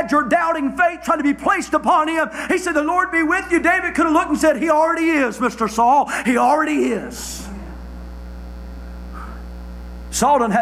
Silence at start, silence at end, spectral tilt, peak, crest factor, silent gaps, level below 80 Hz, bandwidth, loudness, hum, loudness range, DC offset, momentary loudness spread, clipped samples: 0 s; 0 s; -4.5 dB/octave; -6 dBFS; 14 dB; none; -38 dBFS; 16 kHz; -17 LUFS; 60 Hz at -45 dBFS; 9 LU; under 0.1%; 19 LU; under 0.1%